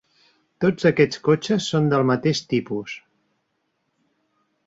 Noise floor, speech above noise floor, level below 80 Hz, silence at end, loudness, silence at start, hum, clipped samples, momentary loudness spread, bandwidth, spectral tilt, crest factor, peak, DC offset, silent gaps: -73 dBFS; 53 dB; -60 dBFS; 1.7 s; -21 LUFS; 0.6 s; none; under 0.1%; 12 LU; 8 kHz; -6 dB/octave; 18 dB; -4 dBFS; under 0.1%; none